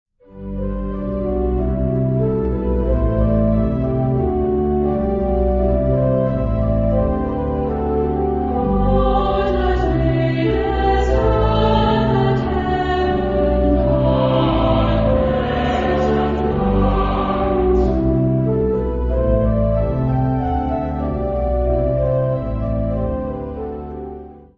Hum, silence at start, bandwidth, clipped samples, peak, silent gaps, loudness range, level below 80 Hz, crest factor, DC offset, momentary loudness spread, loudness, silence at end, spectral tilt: none; 0.3 s; 7 kHz; under 0.1%; -2 dBFS; none; 3 LU; -24 dBFS; 14 dB; under 0.1%; 6 LU; -18 LUFS; 0.15 s; -9.5 dB/octave